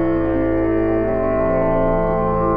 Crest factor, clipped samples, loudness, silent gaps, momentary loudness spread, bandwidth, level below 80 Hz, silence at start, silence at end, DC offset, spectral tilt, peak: 12 dB; under 0.1%; -18 LUFS; none; 1 LU; 4.8 kHz; -28 dBFS; 0 s; 0 s; under 0.1%; -11.5 dB/octave; -6 dBFS